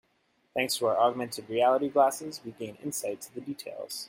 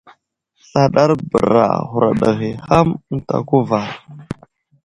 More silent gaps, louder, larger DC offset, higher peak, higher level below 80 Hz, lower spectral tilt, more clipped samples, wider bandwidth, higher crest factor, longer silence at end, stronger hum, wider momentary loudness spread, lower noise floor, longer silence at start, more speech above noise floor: neither; second, -29 LUFS vs -16 LUFS; neither; second, -10 dBFS vs 0 dBFS; second, -76 dBFS vs -44 dBFS; second, -3.5 dB/octave vs -7.5 dB/octave; neither; first, 16.5 kHz vs 11 kHz; about the same, 18 dB vs 16 dB; second, 0 s vs 0.5 s; neither; second, 14 LU vs 18 LU; first, -71 dBFS vs -62 dBFS; second, 0.55 s vs 0.75 s; second, 42 dB vs 46 dB